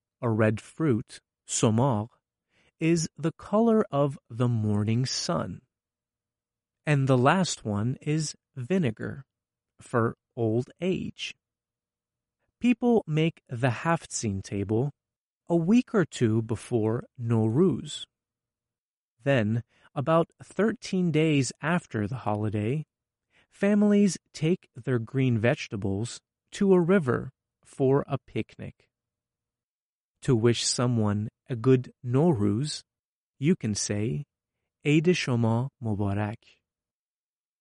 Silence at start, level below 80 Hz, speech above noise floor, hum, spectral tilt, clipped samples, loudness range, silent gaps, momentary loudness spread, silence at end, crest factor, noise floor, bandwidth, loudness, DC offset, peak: 0.2 s; -62 dBFS; over 64 dB; none; -6 dB/octave; under 0.1%; 3 LU; 15.16-15.41 s, 18.78-19.17 s, 29.64-30.15 s, 32.99-33.34 s; 12 LU; 1.25 s; 18 dB; under -90 dBFS; 11.5 kHz; -27 LUFS; under 0.1%; -10 dBFS